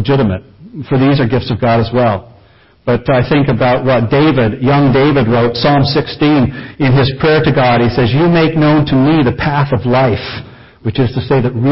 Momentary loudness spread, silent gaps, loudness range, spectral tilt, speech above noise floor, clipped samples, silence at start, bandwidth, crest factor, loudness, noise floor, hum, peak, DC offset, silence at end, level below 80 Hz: 7 LU; none; 2 LU; -11.5 dB/octave; 34 dB; under 0.1%; 0 s; 5.8 kHz; 12 dB; -12 LUFS; -45 dBFS; none; 0 dBFS; under 0.1%; 0 s; -34 dBFS